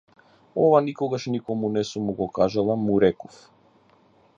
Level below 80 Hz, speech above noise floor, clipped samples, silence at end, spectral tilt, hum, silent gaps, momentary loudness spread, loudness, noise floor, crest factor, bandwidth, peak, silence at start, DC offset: -58 dBFS; 36 dB; under 0.1%; 1.15 s; -7 dB/octave; none; none; 9 LU; -23 LUFS; -58 dBFS; 20 dB; 7.8 kHz; -4 dBFS; 0.55 s; under 0.1%